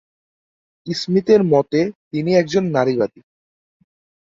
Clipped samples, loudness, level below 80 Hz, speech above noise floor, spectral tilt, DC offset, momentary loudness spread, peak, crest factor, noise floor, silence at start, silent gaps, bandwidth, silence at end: under 0.1%; -18 LUFS; -60 dBFS; over 73 dB; -6.5 dB/octave; under 0.1%; 11 LU; -2 dBFS; 18 dB; under -90 dBFS; 0.85 s; 1.95-2.11 s; 7.8 kHz; 1.15 s